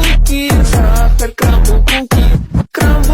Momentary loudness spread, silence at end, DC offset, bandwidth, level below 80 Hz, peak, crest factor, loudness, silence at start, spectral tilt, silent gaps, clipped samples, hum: 3 LU; 0 s; under 0.1%; 16.5 kHz; -10 dBFS; 0 dBFS; 8 dB; -12 LUFS; 0 s; -5 dB/octave; none; under 0.1%; none